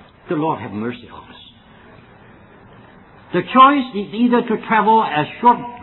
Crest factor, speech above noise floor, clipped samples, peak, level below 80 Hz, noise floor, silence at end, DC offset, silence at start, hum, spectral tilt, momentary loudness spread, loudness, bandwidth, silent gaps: 18 dB; 28 dB; under 0.1%; 0 dBFS; -56 dBFS; -45 dBFS; 0 s; under 0.1%; 0.3 s; none; -9.5 dB/octave; 15 LU; -16 LUFS; 4.2 kHz; none